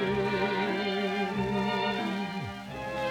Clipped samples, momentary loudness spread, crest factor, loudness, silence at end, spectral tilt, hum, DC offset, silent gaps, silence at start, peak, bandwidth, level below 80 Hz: under 0.1%; 8 LU; 14 dB; -30 LUFS; 0 s; -6 dB/octave; none; under 0.1%; none; 0 s; -16 dBFS; 16.5 kHz; -54 dBFS